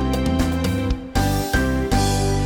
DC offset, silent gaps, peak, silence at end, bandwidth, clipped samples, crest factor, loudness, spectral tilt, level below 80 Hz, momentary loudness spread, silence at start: under 0.1%; none; -6 dBFS; 0 s; over 20 kHz; under 0.1%; 14 dB; -21 LUFS; -5.5 dB/octave; -26 dBFS; 3 LU; 0 s